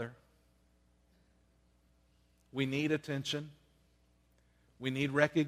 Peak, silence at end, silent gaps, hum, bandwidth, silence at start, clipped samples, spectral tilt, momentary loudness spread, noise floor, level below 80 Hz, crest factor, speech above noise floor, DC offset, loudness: -12 dBFS; 0 s; none; 60 Hz at -70 dBFS; 15 kHz; 0 s; under 0.1%; -5.5 dB/octave; 14 LU; -70 dBFS; -70 dBFS; 26 dB; 37 dB; under 0.1%; -35 LUFS